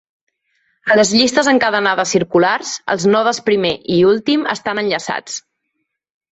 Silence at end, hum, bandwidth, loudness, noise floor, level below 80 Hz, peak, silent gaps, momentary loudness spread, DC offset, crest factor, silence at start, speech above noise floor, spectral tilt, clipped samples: 0.95 s; none; 8.2 kHz; -15 LUFS; -73 dBFS; -56 dBFS; 0 dBFS; none; 9 LU; under 0.1%; 16 dB; 0.85 s; 58 dB; -3.5 dB/octave; under 0.1%